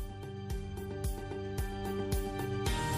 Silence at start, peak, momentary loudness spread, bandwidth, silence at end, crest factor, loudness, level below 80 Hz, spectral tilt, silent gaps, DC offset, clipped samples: 0 s; -20 dBFS; 6 LU; 15.5 kHz; 0 s; 16 dB; -38 LUFS; -42 dBFS; -5.5 dB/octave; none; under 0.1%; under 0.1%